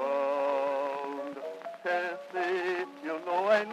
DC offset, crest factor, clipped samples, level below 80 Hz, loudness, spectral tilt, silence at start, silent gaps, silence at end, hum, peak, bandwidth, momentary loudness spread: under 0.1%; 18 dB; under 0.1%; under -90 dBFS; -32 LUFS; -4.5 dB/octave; 0 s; none; 0 s; none; -12 dBFS; 13 kHz; 10 LU